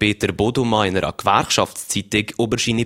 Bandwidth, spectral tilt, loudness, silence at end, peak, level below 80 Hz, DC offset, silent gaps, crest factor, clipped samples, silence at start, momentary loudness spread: 16.5 kHz; -4 dB/octave; -19 LUFS; 0 s; 0 dBFS; -44 dBFS; under 0.1%; none; 20 dB; under 0.1%; 0 s; 5 LU